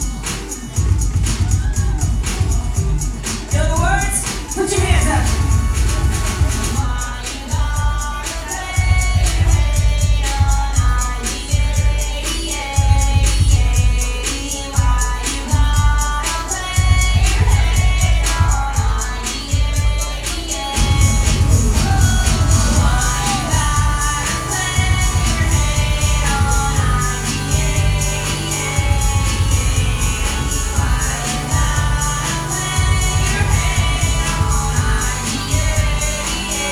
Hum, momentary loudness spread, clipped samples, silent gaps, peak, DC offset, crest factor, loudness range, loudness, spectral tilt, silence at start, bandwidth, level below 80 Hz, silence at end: none; 6 LU; under 0.1%; none; 0 dBFS; under 0.1%; 14 dB; 3 LU; -17 LUFS; -4 dB/octave; 0 s; 15.5 kHz; -18 dBFS; 0 s